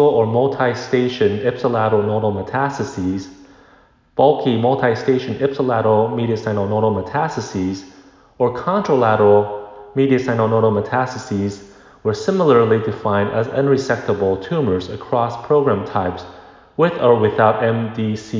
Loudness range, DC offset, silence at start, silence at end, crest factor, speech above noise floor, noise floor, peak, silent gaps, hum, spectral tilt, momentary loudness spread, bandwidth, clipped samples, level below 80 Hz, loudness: 2 LU; under 0.1%; 0 s; 0 s; 16 dB; 35 dB; -51 dBFS; -2 dBFS; none; none; -7 dB/octave; 9 LU; 7.6 kHz; under 0.1%; -48 dBFS; -18 LUFS